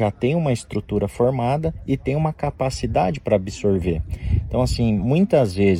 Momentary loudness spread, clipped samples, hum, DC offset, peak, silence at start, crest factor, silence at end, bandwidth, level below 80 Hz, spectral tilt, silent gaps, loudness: 7 LU; under 0.1%; none; under 0.1%; -4 dBFS; 0 s; 16 dB; 0 s; 14.5 kHz; -34 dBFS; -7.5 dB/octave; none; -21 LUFS